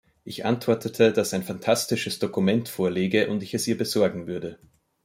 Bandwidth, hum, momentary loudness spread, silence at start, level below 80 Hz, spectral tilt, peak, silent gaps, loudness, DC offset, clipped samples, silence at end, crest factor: 16.5 kHz; none; 11 LU; 0.25 s; -64 dBFS; -5 dB/octave; -6 dBFS; none; -25 LUFS; under 0.1%; under 0.1%; 0.5 s; 18 dB